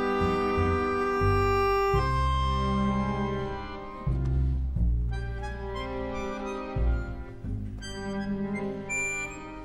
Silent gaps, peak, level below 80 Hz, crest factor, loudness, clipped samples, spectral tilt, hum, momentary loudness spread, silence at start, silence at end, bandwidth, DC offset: none; -12 dBFS; -34 dBFS; 16 dB; -29 LUFS; under 0.1%; -6.5 dB/octave; none; 12 LU; 0 s; 0 s; 15 kHz; under 0.1%